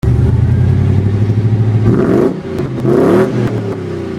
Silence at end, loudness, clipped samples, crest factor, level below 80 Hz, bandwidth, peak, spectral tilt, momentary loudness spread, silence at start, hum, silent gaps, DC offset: 0 s; -12 LUFS; under 0.1%; 12 dB; -26 dBFS; 9.4 kHz; 0 dBFS; -9.5 dB/octave; 8 LU; 0.05 s; none; none; under 0.1%